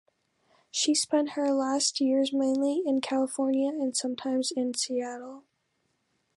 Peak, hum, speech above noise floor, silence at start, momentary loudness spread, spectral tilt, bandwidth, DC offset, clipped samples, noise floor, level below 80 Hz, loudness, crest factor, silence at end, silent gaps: -12 dBFS; none; 48 dB; 0.75 s; 6 LU; -1.5 dB/octave; 11.5 kHz; under 0.1%; under 0.1%; -76 dBFS; -84 dBFS; -28 LUFS; 16 dB; 0.95 s; none